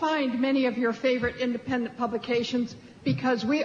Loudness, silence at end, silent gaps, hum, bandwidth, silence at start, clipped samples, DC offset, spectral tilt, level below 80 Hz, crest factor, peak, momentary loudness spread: -27 LUFS; 0 s; none; none; 7.4 kHz; 0 s; under 0.1%; under 0.1%; -6 dB/octave; -60 dBFS; 12 dB; -14 dBFS; 6 LU